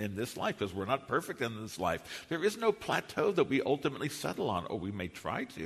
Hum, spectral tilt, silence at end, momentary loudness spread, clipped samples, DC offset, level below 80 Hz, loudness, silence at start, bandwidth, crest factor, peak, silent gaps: none; -5 dB/octave; 0 s; 8 LU; under 0.1%; under 0.1%; -64 dBFS; -34 LUFS; 0 s; 13.5 kHz; 18 dB; -16 dBFS; none